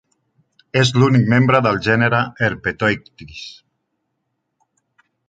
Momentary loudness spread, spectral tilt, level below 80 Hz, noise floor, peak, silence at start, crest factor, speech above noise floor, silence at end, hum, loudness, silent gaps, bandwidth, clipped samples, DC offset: 20 LU; -6 dB/octave; -50 dBFS; -74 dBFS; -2 dBFS; 0.75 s; 18 dB; 57 dB; 1.75 s; none; -16 LUFS; none; 9 kHz; under 0.1%; under 0.1%